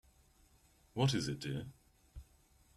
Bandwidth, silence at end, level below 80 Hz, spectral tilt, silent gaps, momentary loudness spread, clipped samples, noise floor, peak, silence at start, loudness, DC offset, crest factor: 13 kHz; 0.55 s; -62 dBFS; -5.5 dB/octave; none; 24 LU; under 0.1%; -69 dBFS; -18 dBFS; 0.95 s; -38 LUFS; under 0.1%; 22 dB